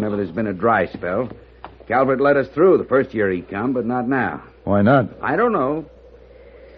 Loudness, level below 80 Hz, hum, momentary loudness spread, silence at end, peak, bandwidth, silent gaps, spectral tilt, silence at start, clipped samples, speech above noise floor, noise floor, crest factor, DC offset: -19 LUFS; -50 dBFS; none; 9 LU; 0.2 s; -2 dBFS; 5.2 kHz; none; -6.5 dB/octave; 0 s; under 0.1%; 26 dB; -44 dBFS; 16 dB; under 0.1%